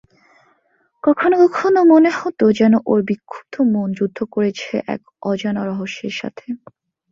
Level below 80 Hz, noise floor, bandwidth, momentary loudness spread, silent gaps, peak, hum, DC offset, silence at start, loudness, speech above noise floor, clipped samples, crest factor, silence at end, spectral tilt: -62 dBFS; -63 dBFS; 7.4 kHz; 15 LU; none; -2 dBFS; none; under 0.1%; 1.05 s; -17 LUFS; 46 dB; under 0.1%; 16 dB; 0.55 s; -7 dB/octave